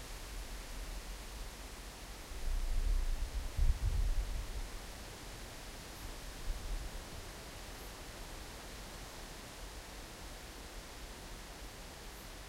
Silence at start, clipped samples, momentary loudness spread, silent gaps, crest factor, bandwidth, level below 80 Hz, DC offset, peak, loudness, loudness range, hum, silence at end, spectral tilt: 0 s; under 0.1%; 10 LU; none; 22 dB; 16 kHz; -40 dBFS; under 0.1%; -18 dBFS; -45 LUFS; 7 LU; none; 0 s; -4 dB/octave